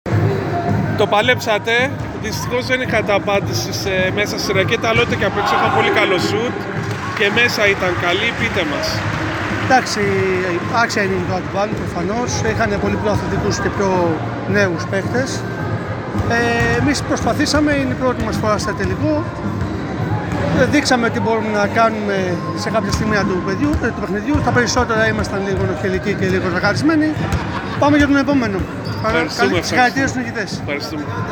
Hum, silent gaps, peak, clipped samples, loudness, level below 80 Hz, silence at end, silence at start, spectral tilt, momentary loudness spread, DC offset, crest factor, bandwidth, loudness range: none; none; -2 dBFS; under 0.1%; -17 LUFS; -38 dBFS; 0 s; 0.05 s; -5 dB/octave; 8 LU; under 0.1%; 16 dB; 19 kHz; 2 LU